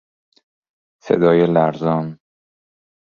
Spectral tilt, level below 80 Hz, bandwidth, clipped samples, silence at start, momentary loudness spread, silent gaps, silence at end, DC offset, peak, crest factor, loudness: -9 dB/octave; -58 dBFS; 7 kHz; under 0.1%; 1.05 s; 9 LU; none; 1 s; under 0.1%; -2 dBFS; 18 dB; -17 LUFS